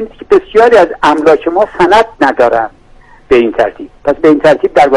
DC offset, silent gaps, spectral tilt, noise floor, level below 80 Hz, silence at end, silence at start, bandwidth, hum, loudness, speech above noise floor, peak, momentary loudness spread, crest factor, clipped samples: under 0.1%; none; -5.5 dB/octave; -39 dBFS; -38 dBFS; 0 s; 0 s; 11.5 kHz; none; -9 LUFS; 30 dB; 0 dBFS; 8 LU; 8 dB; 1%